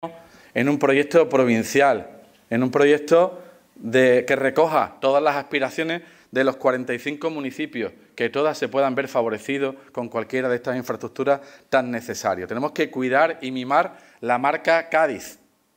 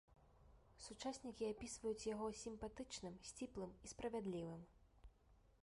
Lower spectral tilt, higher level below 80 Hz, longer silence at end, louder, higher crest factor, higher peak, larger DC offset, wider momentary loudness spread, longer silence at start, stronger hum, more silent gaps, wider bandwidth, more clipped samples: about the same, -5 dB/octave vs -4.5 dB/octave; about the same, -70 dBFS vs -68 dBFS; first, 0.45 s vs 0.1 s; first, -22 LUFS vs -50 LUFS; about the same, 16 dB vs 16 dB; first, -6 dBFS vs -34 dBFS; neither; first, 11 LU vs 8 LU; about the same, 0 s vs 0.1 s; neither; neither; first, 16.5 kHz vs 11.5 kHz; neither